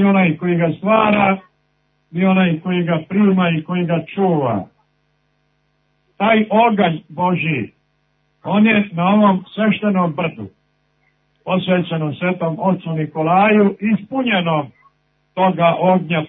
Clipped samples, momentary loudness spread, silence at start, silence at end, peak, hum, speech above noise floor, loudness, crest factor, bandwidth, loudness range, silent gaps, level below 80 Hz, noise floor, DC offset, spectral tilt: under 0.1%; 9 LU; 0 s; 0 s; -2 dBFS; 50 Hz at -45 dBFS; 48 dB; -16 LUFS; 16 dB; 3.9 kHz; 4 LU; none; -60 dBFS; -64 dBFS; under 0.1%; -11 dB/octave